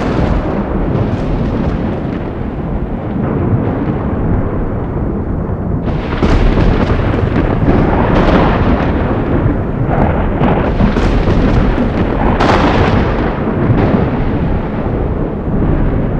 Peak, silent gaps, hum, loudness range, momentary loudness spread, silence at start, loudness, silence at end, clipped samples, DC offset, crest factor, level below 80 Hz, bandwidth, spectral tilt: 0 dBFS; none; none; 4 LU; 7 LU; 0 s; -14 LUFS; 0 s; under 0.1%; under 0.1%; 12 dB; -18 dBFS; 7.6 kHz; -8.5 dB/octave